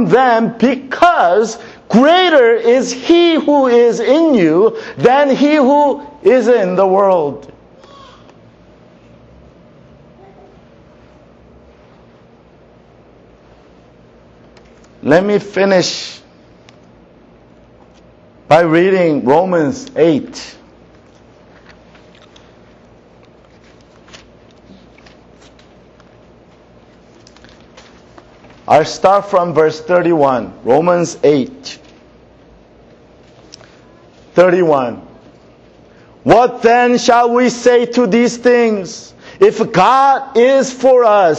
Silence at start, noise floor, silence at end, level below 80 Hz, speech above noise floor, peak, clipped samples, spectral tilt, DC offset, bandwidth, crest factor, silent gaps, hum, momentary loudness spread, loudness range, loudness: 0 s; -44 dBFS; 0 s; -52 dBFS; 33 dB; 0 dBFS; under 0.1%; -5 dB/octave; under 0.1%; 8.4 kHz; 14 dB; none; none; 10 LU; 9 LU; -11 LUFS